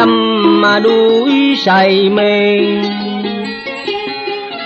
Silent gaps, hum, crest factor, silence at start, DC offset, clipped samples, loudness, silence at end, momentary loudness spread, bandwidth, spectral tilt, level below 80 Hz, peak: none; none; 10 dB; 0 s; under 0.1%; under 0.1%; -12 LUFS; 0 s; 11 LU; 8.2 kHz; -6 dB/octave; -58 dBFS; -2 dBFS